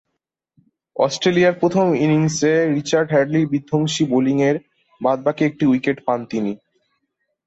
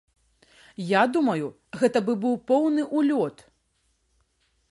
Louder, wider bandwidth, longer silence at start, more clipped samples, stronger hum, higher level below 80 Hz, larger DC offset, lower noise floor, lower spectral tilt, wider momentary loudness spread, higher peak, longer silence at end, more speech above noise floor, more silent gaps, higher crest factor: first, -18 LUFS vs -24 LUFS; second, 8.2 kHz vs 11.5 kHz; first, 0.95 s vs 0.8 s; neither; neither; first, -60 dBFS vs -70 dBFS; neither; first, -78 dBFS vs -70 dBFS; about the same, -5.5 dB/octave vs -6.5 dB/octave; about the same, 8 LU vs 10 LU; about the same, -4 dBFS vs -6 dBFS; second, 0.9 s vs 1.4 s; first, 61 dB vs 47 dB; neither; about the same, 16 dB vs 20 dB